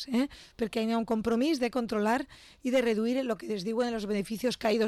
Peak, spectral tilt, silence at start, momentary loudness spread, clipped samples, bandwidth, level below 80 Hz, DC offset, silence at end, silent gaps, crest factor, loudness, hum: -18 dBFS; -5 dB/octave; 0 s; 6 LU; under 0.1%; 13.5 kHz; -60 dBFS; under 0.1%; 0 s; none; 10 dB; -30 LUFS; none